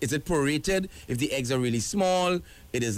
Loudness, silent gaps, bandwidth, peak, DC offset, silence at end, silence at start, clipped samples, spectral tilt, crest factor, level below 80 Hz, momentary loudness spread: -27 LUFS; none; 16 kHz; -16 dBFS; under 0.1%; 0 s; 0 s; under 0.1%; -4.5 dB/octave; 12 dB; -48 dBFS; 7 LU